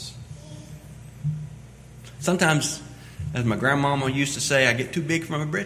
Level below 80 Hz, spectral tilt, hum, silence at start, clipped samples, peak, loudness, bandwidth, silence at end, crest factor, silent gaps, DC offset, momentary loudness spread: -50 dBFS; -4.5 dB/octave; none; 0 s; under 0.1%; -4 dBFS; -23 LUFS; 16 kHz; 0 s; 22 dB; none; under 0.1%; 22 LU